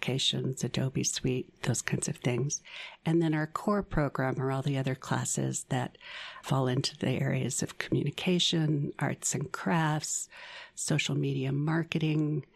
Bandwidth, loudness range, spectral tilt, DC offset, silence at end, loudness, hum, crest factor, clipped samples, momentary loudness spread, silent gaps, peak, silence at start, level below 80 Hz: 14 kHz; 2 LU; -4.5 dB/octave; under 0.1%; 0.15 s; -31 LUFS; none; 20 dB; under 0.1%; 6 LU; none; -10 dBFS; 0 s; -56 dBFS